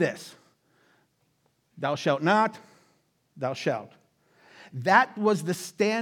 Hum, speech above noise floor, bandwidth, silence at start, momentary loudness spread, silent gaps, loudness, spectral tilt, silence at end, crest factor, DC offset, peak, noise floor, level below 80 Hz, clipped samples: none; 45 dB; 18 kHz; 0 s; 14 LU; none; -26 LUFS; -5 dB/octave; 0 s; 24 dB; under 0.1%; -4 dBFS; -70 dBFS; -86 dBFS; under 0.1%